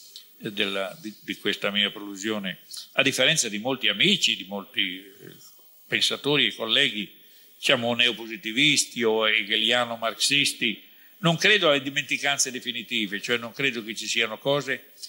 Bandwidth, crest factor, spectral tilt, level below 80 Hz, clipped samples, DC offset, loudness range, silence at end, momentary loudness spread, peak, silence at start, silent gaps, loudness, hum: 16 kHz; 22 dB; -2 dB/octave; -74 dBFS; under 0.1%; under 0.1%; 3 LU; 0 s; 12 LU; -4 dBFS; 0 s; none; -23 LUFS; none